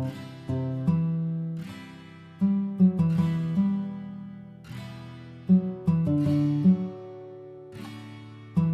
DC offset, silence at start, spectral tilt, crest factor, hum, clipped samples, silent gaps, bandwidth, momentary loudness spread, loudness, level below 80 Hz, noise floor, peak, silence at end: under 0.1%; 0 s; -9.5 dB/octave; 16 dB; none; under 0.1%; none; 5.8 kHz; 21 LU; -26 LUFS; -52 dBFS; -46 dBFS; -12 dBFS; 0 s